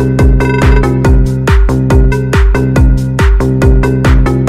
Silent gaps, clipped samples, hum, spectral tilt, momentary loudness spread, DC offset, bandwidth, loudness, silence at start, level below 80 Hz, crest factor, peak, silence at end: none; under 0.1%; none; -7.5 dB/octave; 2 LU; under 0.1%; 12.5 kHz; -10 LUFS; 0 s; -10 dBFS; 8 dB; 0 dBFS; 0 s